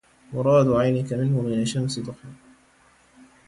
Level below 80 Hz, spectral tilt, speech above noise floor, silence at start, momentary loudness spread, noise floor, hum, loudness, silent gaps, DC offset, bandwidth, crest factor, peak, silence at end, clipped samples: -54 dBFS; -7 dB/octave; 36 dB; 0.3 s; 16 LU; -58 dBFS; none; -22 LUFS; none; under 0.1%; 11.5 kHz; 16 dB; -8 dBFS; 1.15 s; under 0.1%